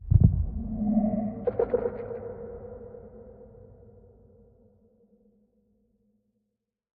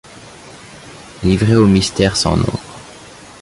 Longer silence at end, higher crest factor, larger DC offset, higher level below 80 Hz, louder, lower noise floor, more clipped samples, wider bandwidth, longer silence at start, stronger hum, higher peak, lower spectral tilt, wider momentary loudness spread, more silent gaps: first, 3.1 s vs 0.35 s; first, 24 dB vs 16 dB; neither; second, -40 dBFS vs -34 dBFS; second, -28 LUFS vs -14 LUFS; first, -82 dBFS vs -38 dBFS; neither; second, 2.6 kHz vs 11.5 kHz; second, 0 s vs 0.15 s; neither; second, -6 dBFS vs -2 dBFS; first, -13.5 dB/octave vs -5.5 dB/octave; about the same, 25 LU vs 25 LU; neither